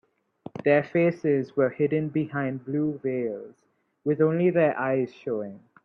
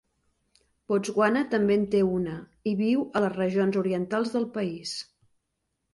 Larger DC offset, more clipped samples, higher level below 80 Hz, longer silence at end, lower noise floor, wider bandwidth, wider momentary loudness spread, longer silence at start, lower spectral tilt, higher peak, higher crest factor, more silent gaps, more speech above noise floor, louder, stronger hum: neither; neither; second, -70 dBFS vs -62 dBFS; second, 0.3 s vs 0.9 s; second, -47 dBFS vs -80 dBFS; second, 6.4 kHz vs 11.5 kHz; about the same, 11 LU vs 10 LU; second, 0.55 s vs 0.9 s; first, -10 dB/octave vs -6 dB/octave; about the same, -8 dBFS vs -10 dBFS; about the same, 16 dB vs 18 dB; neither; second, 22 dB vs 54 dB; about the same, -26 LUFS vs -26 LUFS; neither